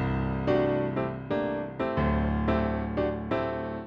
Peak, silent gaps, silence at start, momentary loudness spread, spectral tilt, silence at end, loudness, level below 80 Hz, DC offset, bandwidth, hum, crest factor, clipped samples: -12 dBFS; none; 0 s; 5 LU; -9.5 dB/octave; 0 s; -29 LUFS; -38 dBFS; under 0.1%; 6.6 kHz; none; 16 dB; under 0.1%